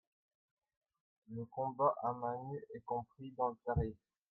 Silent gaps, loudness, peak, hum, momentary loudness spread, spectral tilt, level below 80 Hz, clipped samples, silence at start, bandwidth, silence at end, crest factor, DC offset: none; -40 LUFS; -20 dBFS; none; 13 LU; -11 dB/octave; -58 dBFS; under 0.1%; 1.3 s; 4.2 kHz; 0.35 s; 22 dB; under 0.1%